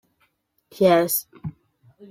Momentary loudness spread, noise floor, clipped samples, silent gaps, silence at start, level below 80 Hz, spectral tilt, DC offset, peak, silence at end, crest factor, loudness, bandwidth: 20 LU; -68 dBFS; under 0.1%; none; 0.8 s; -62 dBFS; -4.5 dB/octave; under 0.1%; -6 dBFS; 0.05 s; 18 dB; -20 LUFS; 16.5 kHz